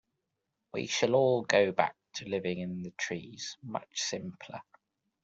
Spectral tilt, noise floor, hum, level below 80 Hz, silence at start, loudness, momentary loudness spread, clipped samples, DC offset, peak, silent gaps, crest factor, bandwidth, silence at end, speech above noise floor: -4 dB/octave; -84 dBFS; none; -74 dBFS; 0.75 s; -31 LUFS; 16 LU; under 0.1%; under 0.1%; -8 dBFS; none; 24 dB; 8 kHz; 0.6 s; 53 dB